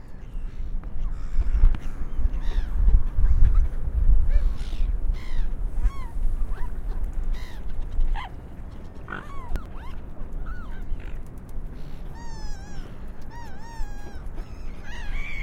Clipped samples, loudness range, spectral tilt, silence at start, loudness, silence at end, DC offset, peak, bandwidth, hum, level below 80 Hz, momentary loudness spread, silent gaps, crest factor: under 0.1%; 13 LU; -7 dB/octave; 0 s; -32 LUFS; 0 s; under 0.1%; -4 dBFS; 5.8 kHz; none; -24 dBFS; 16 LU; none; 18 dB